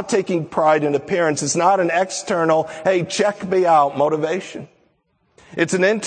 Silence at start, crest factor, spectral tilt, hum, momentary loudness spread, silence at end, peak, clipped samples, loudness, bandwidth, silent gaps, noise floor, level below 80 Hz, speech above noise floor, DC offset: 0 s; 16 dB; -4.5 dB/octave; none; 8 LU; 0 s; -2 dBFS; under 0.1%; -18 LUFS; 9.4 kHz; none; -64 dBFS; -64 dBFS; 46 dB; under 0.1%